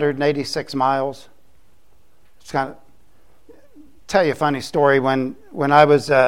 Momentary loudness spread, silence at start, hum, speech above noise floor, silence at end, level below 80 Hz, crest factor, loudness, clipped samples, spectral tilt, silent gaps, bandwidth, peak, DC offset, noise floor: 13 LU; 0 s; none; 42 dB; 0 s; -56 dBFS; 20 dB; -19 LUFS; under 0.1%; -5.5 dB/octave; none; 15.5 kHz; 0 dBFS; 0.7%; -59 dBFS